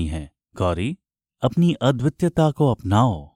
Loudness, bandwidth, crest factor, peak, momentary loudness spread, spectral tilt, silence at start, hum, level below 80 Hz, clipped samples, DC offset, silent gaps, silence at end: -21 LUFS; 11.5 kHz; 16 dB; -4 dBFS; 11 LU; -7.5 dB/octave; 0 s; none; -40 dBFS; under 0.1%; under 0.1%; none; 0.1 s